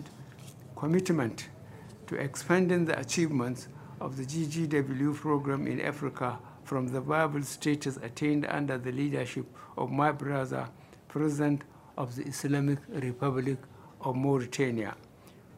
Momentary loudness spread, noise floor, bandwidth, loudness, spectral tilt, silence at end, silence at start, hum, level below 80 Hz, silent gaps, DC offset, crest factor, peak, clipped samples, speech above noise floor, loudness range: 14 LU; -54 dBFS; 16 kHz; -31 LUFS; -6 dB/octave; 0 s; 0 s; none; -68 dBFS; none; under 0.1%; 22 dB; -10 dBFS; under 0.1%; 23 dB; 2 LU